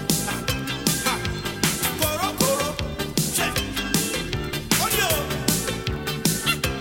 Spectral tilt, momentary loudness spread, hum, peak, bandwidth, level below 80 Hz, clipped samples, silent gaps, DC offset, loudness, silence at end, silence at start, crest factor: -3 dB/octave; 6 LU; none; -4 dBFS; 17 kHz; -38 dBFS; under 0.1%; none; under 0.1%; -23 LUFS; 0 s; 0 s; 20 dB